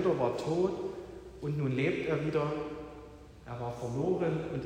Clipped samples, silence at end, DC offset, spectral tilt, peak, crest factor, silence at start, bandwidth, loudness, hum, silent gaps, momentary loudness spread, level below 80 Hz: under 0.1%; 0 s; under 0.1%; -7.5 dB/octave; -18 dBFS; 16 dB; 0 s; 10.5 kHz; -33 LUFS; none; none; 16 LU; -58 dBFS